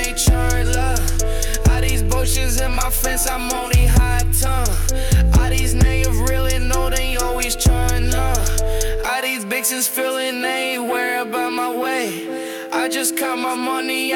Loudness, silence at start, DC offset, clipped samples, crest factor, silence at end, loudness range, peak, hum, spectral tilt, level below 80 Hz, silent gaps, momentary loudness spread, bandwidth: -19 LUFS; 0 s; under 0.1%; under 0.1%; 12 dB; 0 s; 3 LU; -4 dBFS; none; -4 dB/octave; -20 dBFS; none; 5 LU; 18 kHz